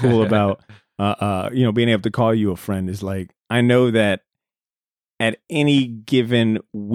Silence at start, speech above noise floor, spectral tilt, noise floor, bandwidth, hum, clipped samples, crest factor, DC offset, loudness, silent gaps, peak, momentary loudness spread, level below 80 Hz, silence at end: 0 s; over 71 dB; -7 dB/octave; under -90 dBFS; 15.5 kHz; none; under 0.1%; 16 dB; under 0.1%; -19 LUFS; none; -2 dBFS; 9 LU; -56 dBFS; 0 s